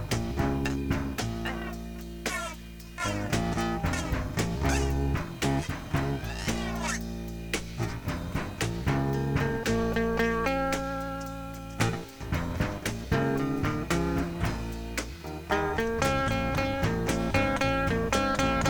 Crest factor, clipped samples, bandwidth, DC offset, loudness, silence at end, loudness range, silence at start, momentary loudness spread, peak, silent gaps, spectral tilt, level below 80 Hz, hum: 20 dB; under 0.1%; over 20 kHz; under 0.1%; -30 LUFS; 0 s; 4 LU; 0 s; 9 LU; -10 dBFS; none; -5.5 dB/octave; -38 dBFS; none